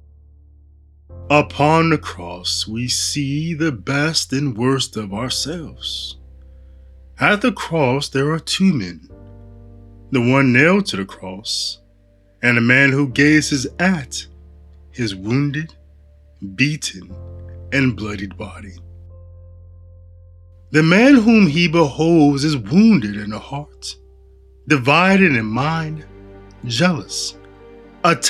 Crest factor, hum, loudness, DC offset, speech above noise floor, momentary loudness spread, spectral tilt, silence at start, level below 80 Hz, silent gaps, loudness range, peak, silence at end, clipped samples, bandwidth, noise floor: 18 dB; none; -17 LUFS; under 0.1%; 35 dB; 18 LU; -5 dB/octave; 1.1 s; -46 dBFS; none; 9 LU; 0 dBFS; 0 s; under 0.1%; 14 kHz; -52 dBFS